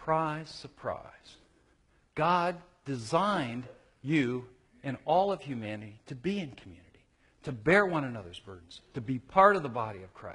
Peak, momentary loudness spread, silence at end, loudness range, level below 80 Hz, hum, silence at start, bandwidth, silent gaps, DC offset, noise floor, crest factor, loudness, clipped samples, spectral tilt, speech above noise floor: -8 dBFS; 20 LU; 0 s; 5 LU; -62 dBFS; none; 0 s; 11 kHz; none; under 0.1%; -67 dBFS; 24 dB; -30 LUFS; under 0.1%; -6.5 dB/octave; 36 dB